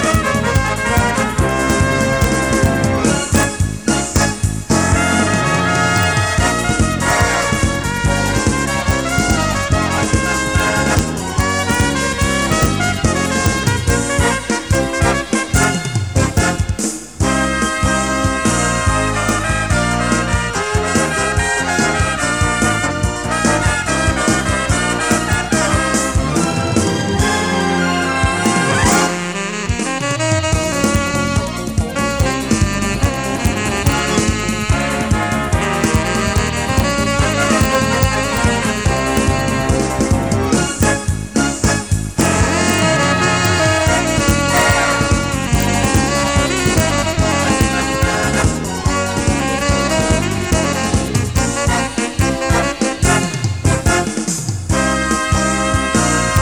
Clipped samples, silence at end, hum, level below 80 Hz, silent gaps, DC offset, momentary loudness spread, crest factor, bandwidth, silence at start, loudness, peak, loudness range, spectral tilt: under 0.1%; 0 s; none; -26 dBFS; none; 0.4%; 4 LU; 16 dB; over 20 kHz; 0 s; -15 LUFS; 0 dBFS; 2 LU; -4 dB/octave